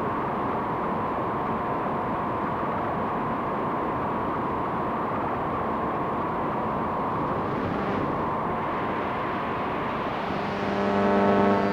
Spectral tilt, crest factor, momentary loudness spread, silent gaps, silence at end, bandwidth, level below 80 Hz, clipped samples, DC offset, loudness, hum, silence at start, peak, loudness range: -8 dB/octave; 18 dB; 5 LU; none; 0 s; 15 kHz; -50 dBFS; under 0.1%; under 0.1%; -27 LUFS; none; 0 s; -8 dBFS; 1 LU